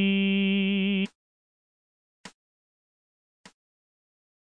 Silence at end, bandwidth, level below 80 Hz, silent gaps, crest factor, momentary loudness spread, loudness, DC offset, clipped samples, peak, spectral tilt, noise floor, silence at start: 2.25 s; 7.2 kHz; -80 dBFS; 1.15-2.24 s; 16 dB; 6 LU; -25 LUFS; under 0.1%; under 0.1%; -14 dBFS; -7 dB/octave; under -90 dBFS; 0 s